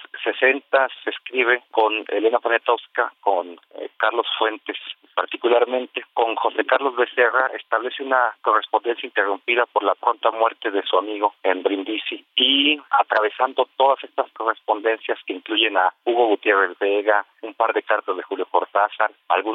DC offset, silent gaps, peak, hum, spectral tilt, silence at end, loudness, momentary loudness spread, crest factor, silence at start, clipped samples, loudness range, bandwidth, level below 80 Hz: under 0.1%; none; -4 dBFS; none; -4 dB/octave; 0 s; -21 LUFS; 8 LU; 16 dB; 0 s; under 0.1%; 3 LU; 4.5 kHz; under -90 dBFS